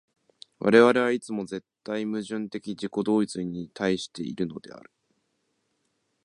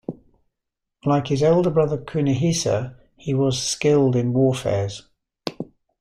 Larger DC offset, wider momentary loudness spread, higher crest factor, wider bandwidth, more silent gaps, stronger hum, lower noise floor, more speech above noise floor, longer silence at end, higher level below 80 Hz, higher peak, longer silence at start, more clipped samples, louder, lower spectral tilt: neither; about the same, 16 LU vs 17 LU; first, 24 dB vs 18 dB; second, 11 kHz vs 13 kHz; neither; neither; second, -75 dBFS vs -82 dBFS; second, 49 dB vs 62 dB; first, 1.45 s vs 0.35 s; second, -66 dBFS vs -52 dBFS; about the same, -4 dBFS vs -4 dBFS; first, 0.6 s vs 0.1 s; neither; second, -26 LUFS vs -21 LUFS; about the same, -5.5 dB/octave vs -6 dB/octave